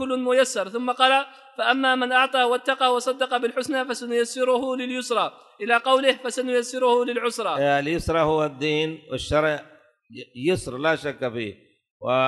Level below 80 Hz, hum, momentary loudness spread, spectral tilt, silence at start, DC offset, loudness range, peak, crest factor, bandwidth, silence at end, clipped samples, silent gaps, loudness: -50 dBFS; none; 9 LU; -3.5 dB/octave; 0 s; under 0.1%; 4 LU; -4 dBFS; 18 dB; 12 kHz; 0 s; under 0.1%; 11.91-12.00 s; -23 LUFS